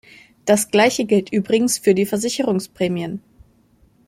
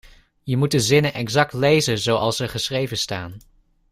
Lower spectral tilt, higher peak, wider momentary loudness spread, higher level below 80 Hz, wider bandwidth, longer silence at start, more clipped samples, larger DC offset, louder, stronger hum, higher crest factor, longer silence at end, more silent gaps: about the same, -4.5 dB/octave vs -4.5 dB/octave; about the same, -2 dBFS vs -4 dBFS; about the same, 10 LU vs 9 LU; second, -58 dBFS vs -50 dBFS; about the same, 16.5 kHz vs 15.5 kHz; about the same, 0.45 s vs 0.45 s; neither; neither; about the same, -19 LUFS vs -20 LUFS; neither; about the same, 18 dB vs 18 dB; first, 0.9 s vs 0.55 s; neither